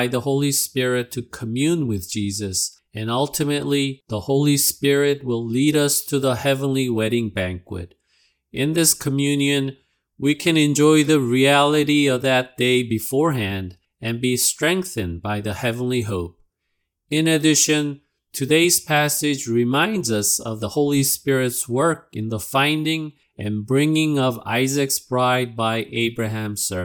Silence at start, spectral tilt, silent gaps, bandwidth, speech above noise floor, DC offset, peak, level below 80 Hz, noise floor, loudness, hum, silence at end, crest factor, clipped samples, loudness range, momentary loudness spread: 0 s; -4 dB/octave; none; 18 kHz; 55 dB; under 0.1%; -2 dBFS; -58 dBFS; -75 dBFS; -20 LUFS; none; 0 s; 20 dB; under 0.1%; 5 LU; 11 LU